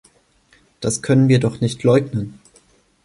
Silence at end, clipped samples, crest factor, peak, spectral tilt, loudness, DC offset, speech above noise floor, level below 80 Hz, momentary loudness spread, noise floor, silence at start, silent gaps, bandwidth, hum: 0.7 s; under 0.1%; 16 dB; -4 dBFS; -6.5 dB/octave; -18 LUFS; under 0.1%; 40 dB; -52 dBFS; 13 LU; -56 dBFS; 0.8 s; none; 11.5 kHz; none